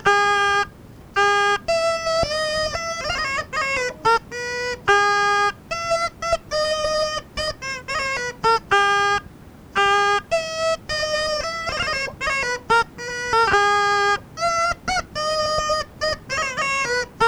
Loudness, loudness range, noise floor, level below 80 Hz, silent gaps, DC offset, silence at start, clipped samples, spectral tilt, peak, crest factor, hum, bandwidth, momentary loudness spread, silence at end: -21 LUFS; 2 LU; -42 dBFS; -44 dBFS; none; under 0.1%; 0 s; under 0.1%; -2 dB/octave; -6 dBFS; 16 dB; none; over 20 kHz; 8 LU; 0 s